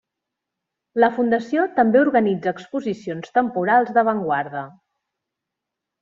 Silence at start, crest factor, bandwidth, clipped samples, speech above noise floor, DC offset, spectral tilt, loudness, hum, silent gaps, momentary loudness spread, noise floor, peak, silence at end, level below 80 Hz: 0.95 s; 18 dB; 7.4 kHz; under 0.1%; 64 dB; under 0.1%; -7.5 dB/octave; -20 LUFS; none; none; 13 LU; -83 dBFS; -4 dBFS; 1.3 s; -66 dBFS